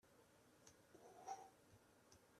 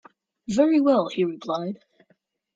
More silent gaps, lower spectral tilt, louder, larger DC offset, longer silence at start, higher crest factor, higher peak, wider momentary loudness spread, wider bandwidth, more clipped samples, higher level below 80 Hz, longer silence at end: neither; second, -3 dB/octave vs -6.5 dB/octave; second, -61 LUFS vs -23 LUFS; neither; second, 0.05 s vs 0.5 s; about the same, 22 dB vs 18 dB; second, -40 dBFS vs -6 dBFS; second, 13 LU vs 18 LU; first, 14 kHz vs 7.8 kHz; neither; second, -90 dBFS vs -66 dBFS; second, 0 s vs 0.8 s